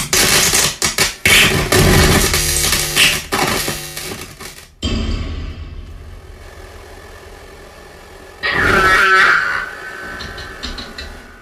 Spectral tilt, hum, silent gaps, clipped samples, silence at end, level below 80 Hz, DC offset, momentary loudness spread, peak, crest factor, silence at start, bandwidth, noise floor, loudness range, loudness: -2 dB/octave; none; none; under 0.1%; 0.05 s; -28 dBFS; under 0.1%; 21 LU; 0 dBFS; 16 dB; 0 s; 16 kHz; -37 dBFS; 16 LU; -12 LUFS